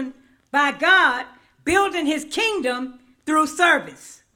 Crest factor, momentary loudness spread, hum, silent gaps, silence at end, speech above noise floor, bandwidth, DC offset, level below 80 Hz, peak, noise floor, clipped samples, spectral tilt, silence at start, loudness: 18 dB; 19 LU; none; none; 0.25 s; 19 dB; 17.5 kHz; under 0.1%; -56 dBFS; -2 dBFS; -39 dBFS; under 0.1%; -2 dB/octave; 0 s; -19 LUFS